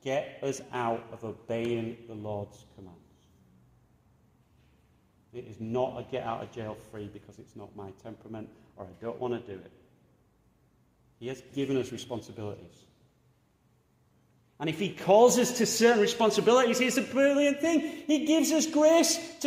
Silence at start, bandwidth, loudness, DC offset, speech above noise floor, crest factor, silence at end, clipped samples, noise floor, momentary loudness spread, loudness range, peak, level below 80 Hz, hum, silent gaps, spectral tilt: 0.05 s; 16 kHz; -27 LUFS; under 0.1%; 39 dB; 20 dB; 0 s; under 0.1%; -68 dBFS; 23 LU; 17 LU; -10 dBFS; -70 dBFS; none; none; -4 dB/octave